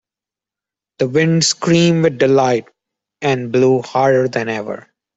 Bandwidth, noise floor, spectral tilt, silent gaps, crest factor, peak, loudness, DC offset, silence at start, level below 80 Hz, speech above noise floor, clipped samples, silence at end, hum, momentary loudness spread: 8.2 kHz; -88 dBFS; -5 dB/octave; none; 14 dB; -2 dBFS; -15 LUFS; under 0.1%; 1 s; -56 dBFS; 74 dB; under 0.1%; 0.35 s; none; 9 LU